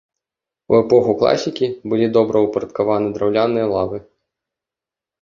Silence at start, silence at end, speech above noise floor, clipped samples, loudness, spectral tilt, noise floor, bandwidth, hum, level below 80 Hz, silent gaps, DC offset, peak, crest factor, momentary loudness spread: 0.7 s; 1.2 s; 71 dB; under 0.1%; -17 LUFS; -6.5 dB/octave; -88 dBFS; 7.4 kHz; none; -52 dBFS; none; under 0.1%; -2 dBFS; 16 dB; 8 LU